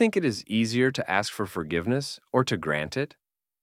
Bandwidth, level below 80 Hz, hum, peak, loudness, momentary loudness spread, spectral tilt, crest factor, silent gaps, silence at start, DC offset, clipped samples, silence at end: 15.5 kHz; -58 dBFS; none; -8 dBFS; -27 LUFS; 7 LU; -5 dB/octave; 20 dB; none; 0 s; under 0.1%; under 0.1%; 0.55 s